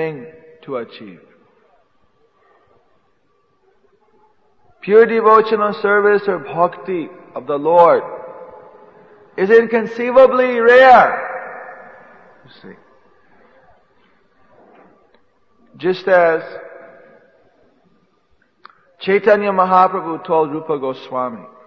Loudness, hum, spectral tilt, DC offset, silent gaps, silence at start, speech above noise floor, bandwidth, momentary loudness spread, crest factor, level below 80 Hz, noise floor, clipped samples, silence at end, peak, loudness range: -14 LUFS; none; -7 dB/octave; under 0.1%; none; 0 s; 48 dB; 6.6 kHz; 21 LU; 18 dB; -60 dBFS; -62 dBFS; under 0.1%; 0.2 s; 0 dBFS; 10 LU